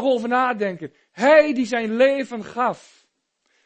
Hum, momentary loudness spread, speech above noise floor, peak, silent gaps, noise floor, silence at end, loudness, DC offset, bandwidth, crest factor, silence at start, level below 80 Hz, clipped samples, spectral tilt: none; 16 LU; 50 dB; -2 dBFS; none; -70 dBFS; 0.9 s; -20 LUFS; under 0.1%; 8.6 kHz; 20 dB; 0 s; -68 dBFS; under 0.1%; -5 dB/octave